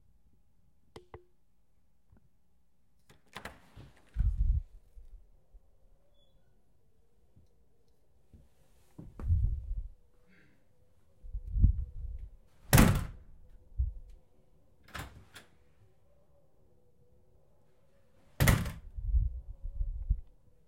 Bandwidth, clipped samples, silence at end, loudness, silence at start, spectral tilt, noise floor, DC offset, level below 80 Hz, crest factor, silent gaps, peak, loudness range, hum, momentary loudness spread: 16 kHz; under 0.1%; 0.45 s; -33 LUFS; 1.15 s; -5.5 dB/octave; -74 dBFS; under 0.1%; -38 dBFS; 28 dB; none; -8 dBFS; 22 LU; none; 27 LU